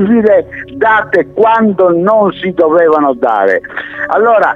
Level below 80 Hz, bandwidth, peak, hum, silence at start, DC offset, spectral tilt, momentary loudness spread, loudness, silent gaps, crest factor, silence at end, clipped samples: -48 dBFS; 6.8 kHz; 0 dBFS; none; 0 s; under 0.1%; -8 dB/octave; 6 LU; -10 LUFS; none; 10 dB; 0 s; under 0.1%